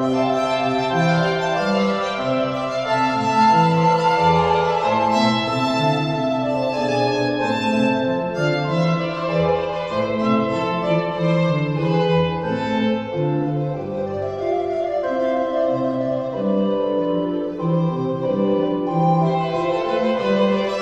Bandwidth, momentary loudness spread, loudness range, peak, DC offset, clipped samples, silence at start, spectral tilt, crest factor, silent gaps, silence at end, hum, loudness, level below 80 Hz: 9 kHz; 6 LU; 4 LU; -4 dBFS; 0.1%; under 0.1%; 0 s; -7 dB/octave; 14 dB; none; 0 s; none; -20 LUFS; -52 dBFS